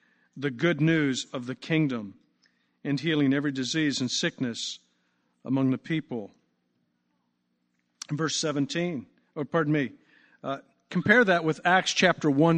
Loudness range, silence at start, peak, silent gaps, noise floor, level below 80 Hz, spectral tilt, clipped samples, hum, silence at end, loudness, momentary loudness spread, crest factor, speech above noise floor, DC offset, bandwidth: 8 LU; 0.35 s; -6 dBFS; none; -75 dBFS; -70 dBFS; -5 dB/octave; under 0.1%; 60 Hz at -60 dBFS; 0 s; -26 LUFS; 15 LU; 22 dB; 49 dB; under 0.1%; 9.6 kHz